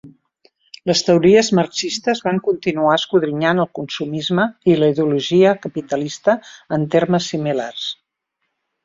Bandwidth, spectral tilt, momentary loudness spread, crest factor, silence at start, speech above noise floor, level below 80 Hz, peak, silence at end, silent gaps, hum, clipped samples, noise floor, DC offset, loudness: 7.8 kHz; -5 dB/octave; 10 LU; 16 dB; 0.05 s; 58 dB; -58 dBFS; -2 dBFS; 0.9 s; none; none; under 0.1%; -75 dBFS; under 0.1%; -18 LUFS